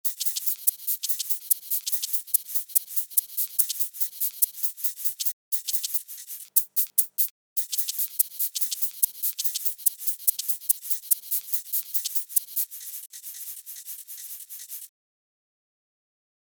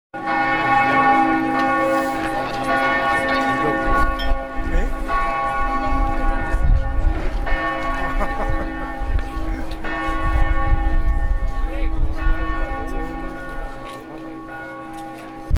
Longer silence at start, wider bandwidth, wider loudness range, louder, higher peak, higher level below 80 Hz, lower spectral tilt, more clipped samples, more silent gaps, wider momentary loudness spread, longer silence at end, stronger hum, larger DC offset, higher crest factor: about the same, 0.05 s vs 0.15 s; first, over 20 kHz vs 12 kHz; second, 6 LU vs 9 LU; second, -24 LUFS vs -21 LUFS; about the same, -2 dBFS vs -4 dBFS; second, under -90 dBFS vs -22 dBFS; second, 6.5 dB/octave vs -6.5 dB/octave; neither; first, 5.33-5.52 s, 7.31-7.56 s vs none; about the same, 13 LU vs 15 LU; first, 1.55 s vs 0 s; neither; neither; first, 28 dB vs 16 dB